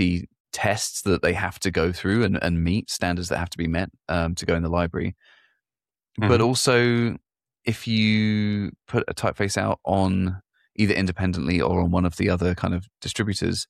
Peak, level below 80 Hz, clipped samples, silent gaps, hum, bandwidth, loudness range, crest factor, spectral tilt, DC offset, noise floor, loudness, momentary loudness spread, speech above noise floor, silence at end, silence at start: -6 dBFS; -42 dBFS; under 0.1%; 0.40-0.45 s; none; 14.5 kHz; 3 LU; 18 dB; -5.5 dB/octave; under 0.1%; under -90 dBFS; -24 LUFS; 9 LU; over 67 dB; 0.05 s; 0 s